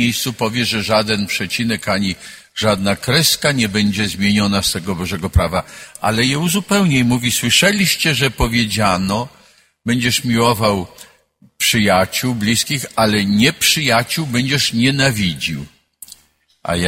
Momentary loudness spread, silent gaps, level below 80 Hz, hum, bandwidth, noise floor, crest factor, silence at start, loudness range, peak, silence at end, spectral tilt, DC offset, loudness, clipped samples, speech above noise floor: 9 LU; none; -36 dBFS; none; 16.5 kHz; -56 dBFS; 16 dB; 0 s; 3 LU; 0 dBFS; 0 s; -4 dB/octave; under 0.1%; -16 LUFS; under 0.1%; 40 dB